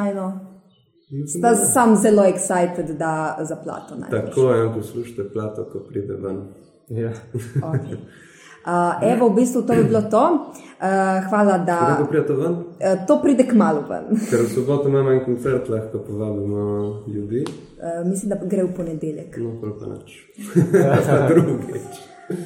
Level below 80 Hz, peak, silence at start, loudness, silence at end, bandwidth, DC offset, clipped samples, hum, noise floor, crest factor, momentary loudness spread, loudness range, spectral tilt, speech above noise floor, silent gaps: -58 dBFS; -2 dBFS; 0 s; -20 LUFS; 0 s; 16.5 kHz; under 0.1%; under 0.1%; none; -57 dBFS; 18 dB; 15 LU; 8 LU; -6.5 dB/octave; 38 dB; none